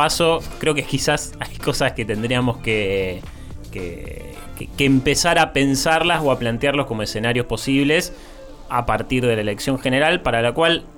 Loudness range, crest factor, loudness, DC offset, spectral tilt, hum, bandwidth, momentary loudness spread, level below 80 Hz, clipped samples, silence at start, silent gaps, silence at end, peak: 5 LU; 16 dB; -19 LUFS; under 0.1%; -4.5 dB/octave; none; 19 kHz; 15 LU; -36 dBFS; under 0.1%; 0 s; none; 0 s; -4 dBFS